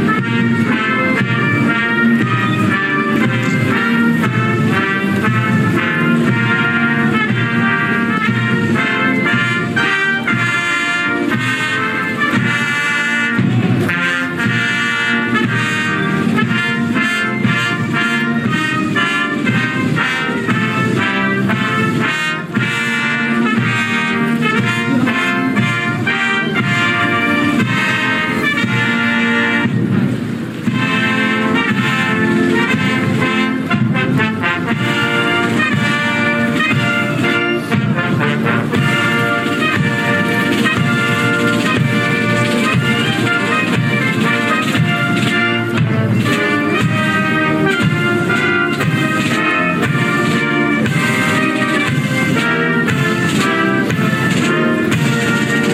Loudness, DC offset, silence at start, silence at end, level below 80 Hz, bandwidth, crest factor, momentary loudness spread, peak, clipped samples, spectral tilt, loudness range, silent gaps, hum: -14 LUFS; under 0.1%; 0 s; 0 s; -54 dBFS; 15.5 kHz; 12 dB; 2 LU; -4 dBFS; under 0.1%; -5.5 dB/octave; 1 LU; none; none